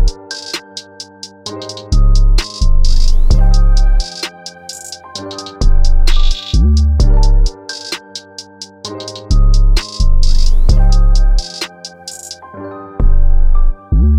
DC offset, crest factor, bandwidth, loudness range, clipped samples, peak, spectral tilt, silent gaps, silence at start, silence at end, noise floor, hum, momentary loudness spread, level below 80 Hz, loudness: under 0.1%; 10 dB; 10 kHz; 2 LU; under 0.1%; 0 dBFS; -5 dB/octave; none; 0 s; 0 s; -33 dBFS; none; 15 LU; -10 dBFS; -16 LUFS